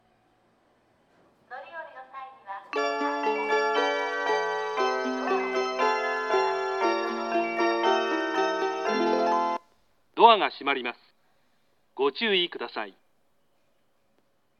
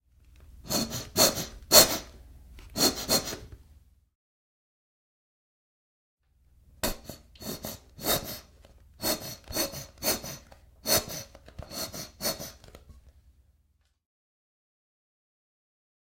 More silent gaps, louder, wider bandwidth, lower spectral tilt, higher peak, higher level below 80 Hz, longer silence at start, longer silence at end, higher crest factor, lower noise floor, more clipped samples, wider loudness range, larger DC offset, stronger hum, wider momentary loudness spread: second, none vs 4.15-6.17 s; about the same, -26 LUFS vs -26 LUFS; second, 8.2 kHz vs 16.5 kHz; first, -3 dB/octave vs -1.5 dB/octave; about the same, -4 dBFS vs -2 dBFS; second, -84 dBFS vs -52 dBFS; first, 1.5 s vs 0.5 s; second, 1.7 s vs 2.95 s; second, 24 dB vs 30 dB; about the same, -72 dBFS vs -70 dBFS; neither; second, 7 LU vs 17 LU; neither; neither; about the same, 17 LU vs 19 LU